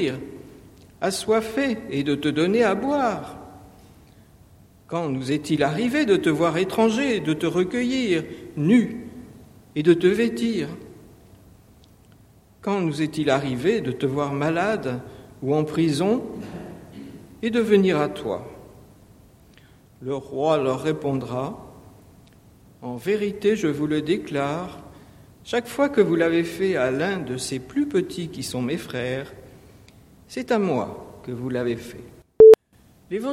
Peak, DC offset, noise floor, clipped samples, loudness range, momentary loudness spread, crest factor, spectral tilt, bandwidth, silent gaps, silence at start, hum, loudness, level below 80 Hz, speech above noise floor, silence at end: -2 dBFS; under 0.1%; -56 dBFS; under 0.1%; 6 LU; 17 LU; 22 dB; -6 dB/octave; 15 kHz; none; 0 s; none; -22 LUFS; -56 dBFS; 33 dB; 0 s